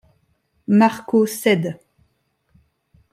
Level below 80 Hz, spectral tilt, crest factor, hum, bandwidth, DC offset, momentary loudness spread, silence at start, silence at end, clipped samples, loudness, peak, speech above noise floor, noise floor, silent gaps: -66 dBFS; -6 dB/octave; 18 dB; none; 15.5 kHz; under 0.1%; 18 LU; 0.7 s; 1.4 s; under 0.1%; -18 LUFS; -4 dBFS; 50 dB; -67 dBFS; none